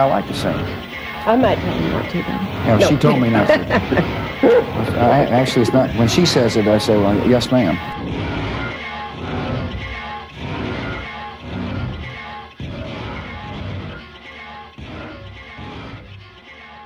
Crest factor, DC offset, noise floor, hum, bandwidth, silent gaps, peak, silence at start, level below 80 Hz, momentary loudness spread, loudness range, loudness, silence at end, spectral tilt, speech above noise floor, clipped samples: 18 dB; under 0.1%; -40 dBFS; none; 16 kHz; none; 0 dBFS; 0 s; -38 dBFS; 20 LU; 16 LU; -18 LUFS; 0 s; -6 dB/octave; 24 dB; under 0.1%